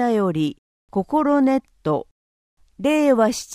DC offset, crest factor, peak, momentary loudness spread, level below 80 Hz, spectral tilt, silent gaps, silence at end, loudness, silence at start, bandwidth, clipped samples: under 0.1%; 16 dB; -4 dBFS; 9 LU; -56 dBFS; -6 dB/octave; 0.58-0.88 s, 2.11-2.57 s; 0 s; -20 LUFS; 0 s; 15.5 kHz; under 0.1%